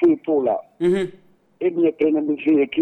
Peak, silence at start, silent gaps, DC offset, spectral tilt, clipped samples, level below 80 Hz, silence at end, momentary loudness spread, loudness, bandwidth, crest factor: -6 dBFS; 0 s; none; under 0.1%; -7.5 dB/octave; under 0.1%; -60 dBFS; 0 s; 6 LU; -21 LUFS; 9.2 kHz; 12 dB